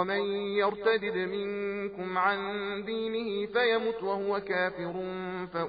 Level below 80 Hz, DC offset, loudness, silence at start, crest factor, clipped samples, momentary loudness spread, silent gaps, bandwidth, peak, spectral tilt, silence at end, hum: -66 dBFS; under 0.1%; -30 LUFS; 0 s; 18 dB; under 0.1%; 8 LU; none; 5 kHz; -12 dBFS; -2.5 dB/octave; 0 s; none